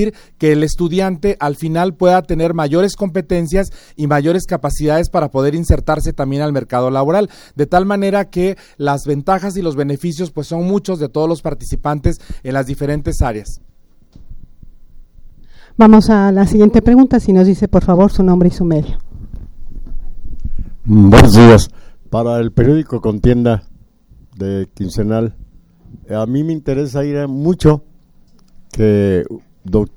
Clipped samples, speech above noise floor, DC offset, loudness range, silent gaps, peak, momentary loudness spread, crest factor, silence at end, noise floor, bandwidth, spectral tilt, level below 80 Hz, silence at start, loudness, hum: 0.3%; 33 dB; under 0.1%; 10 LU; none; 0 dBFS; 14 LU; 14 dB; 0.05 s; -45 dBFS; 17 kHz; -7.5 dB/octave; -26 dBFS; 0 s; -13 LUFS; none